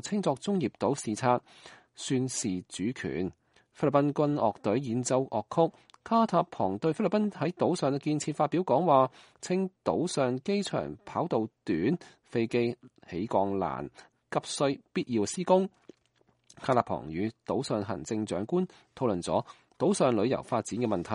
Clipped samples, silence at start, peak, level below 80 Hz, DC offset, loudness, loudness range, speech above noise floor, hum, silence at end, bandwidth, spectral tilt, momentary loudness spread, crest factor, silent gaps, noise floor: under 0.1%; 0.05 s; -8 dBFS; -66 dBFS; under 0.1%; -30 LUFS; 4 LU; 41 dB; none; 0 s; 11.5 kHz; -5.5 dB/octave; 9 LU; 22 dB; none; -70 dBFS